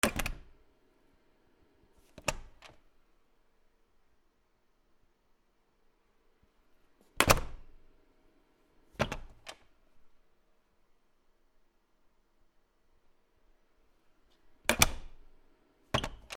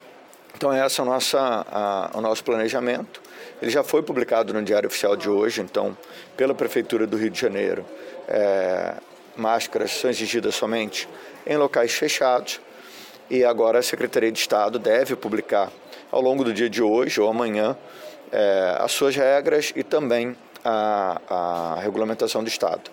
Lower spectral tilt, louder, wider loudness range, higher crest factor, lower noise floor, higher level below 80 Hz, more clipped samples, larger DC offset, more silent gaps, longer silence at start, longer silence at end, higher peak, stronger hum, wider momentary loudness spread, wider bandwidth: about the same, -2.5 dB/octave vs -3.5 dB/octave; second, -31 LUFS vs -23 LUFS; first, 11 LU vs 3 LU; first, 40 dB vs 14 dB; first, -71 dBFS vs -47 dBFS; first, -48 dBFS vs -70 dBFS; neither; neither; neither; about the same, 0.05 s vs 0.05 s; about the same, 0 s vs 0 s; first, 0 dBFS vs -8 dBFS; neither; first, 24 LU vs 11 LU; first, 19.5 kHz vs 17 kHz